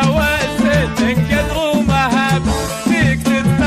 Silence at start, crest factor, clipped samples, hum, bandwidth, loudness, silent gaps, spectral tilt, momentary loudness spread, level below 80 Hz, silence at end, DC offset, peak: 0 s; 8 dB; under 0.1%; none; 15 kHz; -15 LUFS; none; -5.5 dB/octave; 3 LU; -28 dBFS; 0 s; under 0.1%; -6 dBFS